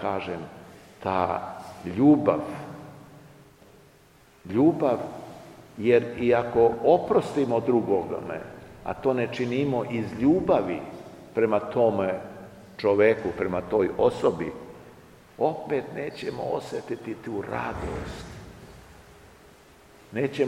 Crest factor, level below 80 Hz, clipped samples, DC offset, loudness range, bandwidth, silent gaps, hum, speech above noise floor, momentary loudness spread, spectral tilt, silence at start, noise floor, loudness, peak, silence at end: 20 dB; -54 dBFS; under 0.1%; under 0.1%; 9 LU; 13.5 kHz; none; none; 31 dB; 20 LU; -7.5 dB/octave; 0 s; -56 dBFS; -25 LUFS; -6 dBFS; 0 s